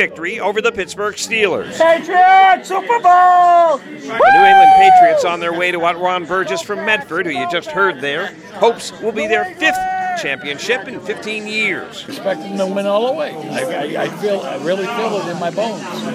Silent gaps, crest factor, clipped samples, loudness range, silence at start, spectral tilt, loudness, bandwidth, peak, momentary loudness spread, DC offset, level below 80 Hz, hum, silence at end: none; 14 dB; under 0.1%; 10 LU; 0 s; -3.5 dB/octave; -14 LUFS; 14 kHz; 0 dBFS; 14 LU; under 0.1%; -58 dBFS; none; 0 s